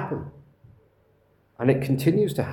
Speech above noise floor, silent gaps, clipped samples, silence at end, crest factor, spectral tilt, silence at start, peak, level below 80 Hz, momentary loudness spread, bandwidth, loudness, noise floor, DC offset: 40 dB; none; under 0.1%; 0 s; 20 dB; -7.5 dB/octave; 0 s; -6 dBFS; -58 dBFS; 12 LU; 18 kHz; -24 LUFS; -63 dBFS; under 0.1%